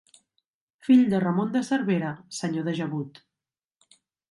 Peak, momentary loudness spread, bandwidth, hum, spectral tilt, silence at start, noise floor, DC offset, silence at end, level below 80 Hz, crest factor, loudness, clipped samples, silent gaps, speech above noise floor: -8 dBFS; 14 LU; 11.5 kHz; none; -6.5 dB/octave; 0.85 s; under -90 dBFS; under 0.1%; 1.2 s; -70 dBFS; 18 dB; -25 LUFS; under 0.1%; none; over 66 dB